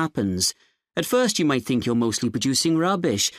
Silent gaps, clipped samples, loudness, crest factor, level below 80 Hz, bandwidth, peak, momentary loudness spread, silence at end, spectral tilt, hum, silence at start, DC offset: none; under 0.1%; -22 LUFS; 14 dB; -58 dBFS; 15.5 kHz; -8 dBFS; 4 LU; 0 s; -4 dB/octave; none; 0 s; under 0.1%